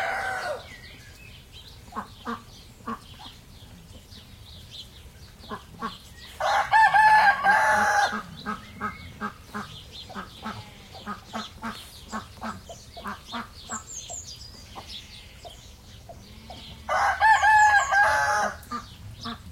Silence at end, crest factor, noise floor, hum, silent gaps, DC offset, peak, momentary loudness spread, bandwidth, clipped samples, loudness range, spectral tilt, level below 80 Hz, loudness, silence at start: 0 s; 20 dB; -47 dBFS; none; none; under 0.1%; -8 dBFS; 27 LU; 16.5 kHz; under 0.1%; 19 LU; -2.5 dB/octave; -52 dBFS; -22 LUFS; 0 s